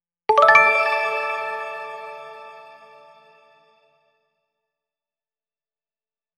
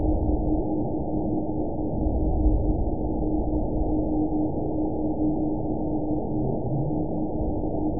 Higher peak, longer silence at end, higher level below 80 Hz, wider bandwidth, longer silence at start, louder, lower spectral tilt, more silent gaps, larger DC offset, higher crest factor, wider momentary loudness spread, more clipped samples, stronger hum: first, 0 dBFS vs -10 dBFS; first, 3.75 s vs 0 s; second, -76 dBFS vs -30 dBFS; first, 15 kHz vs 1 kHz; first, 0.3 s vs 0 s; first, -17 LUFS vs -27 LUFS; second, -2 dB/octave vs -19 dB/octave; neither; second, under 0.1% vs 2%; first, 24 dB vs 14 dB; first, 25 LU vs 3 LU; neither; neither